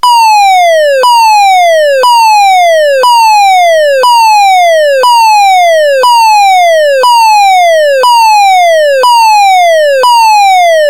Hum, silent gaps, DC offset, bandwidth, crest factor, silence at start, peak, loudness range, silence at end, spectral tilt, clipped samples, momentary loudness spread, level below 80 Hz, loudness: none; none; 1%; 17 kHz; 4 dB; 0.05 s; 0 dBFS; 0 LU; 0 s; 2.5 dB/octave; 7%; 2 LU; -54 dBFS; -4 LUFS